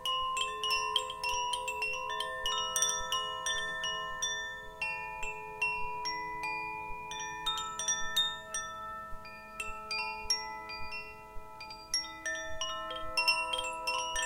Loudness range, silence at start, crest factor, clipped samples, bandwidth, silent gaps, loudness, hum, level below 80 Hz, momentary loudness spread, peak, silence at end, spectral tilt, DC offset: 5 LU; 0 s; 22 dB; under 0.1%; 17 kHz; none; -34 LUFS; none; -54 dBFS; 12 LU; -14 dBFS; 0 s; 0.5 dB/octave; under 0.1%